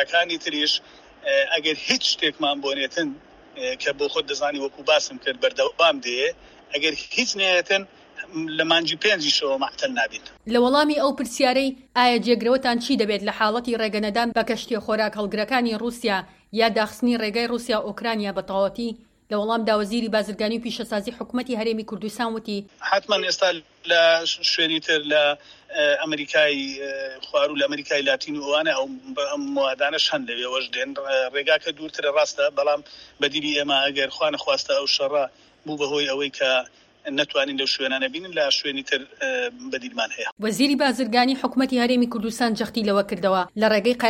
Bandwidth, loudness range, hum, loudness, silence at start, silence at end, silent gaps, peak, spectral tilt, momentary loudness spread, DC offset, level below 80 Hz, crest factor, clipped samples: 16 kHz; 4 LU; none; -22 LUFS; 0 s; 0 s; 40.32-40.37 s; -2 dBFS; -3 dB/octave; 9 LU; under 0.1%; -60 dBFS; 20 dB; under 0.1%